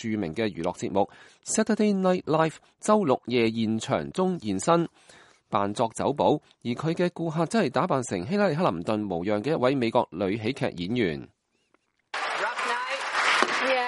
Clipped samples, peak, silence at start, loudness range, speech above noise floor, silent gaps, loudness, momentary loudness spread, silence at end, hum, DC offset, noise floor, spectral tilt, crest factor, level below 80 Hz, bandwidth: under 0.1%; -4 dBFS; 0 s; 3 LU; 44 dB; none; -26 LUFS; 7 LU; 0 s; none; under 0.1%; -70 dBFS; -5 dB/octave; 22 dB; -62 dBFS; 11.5 kHz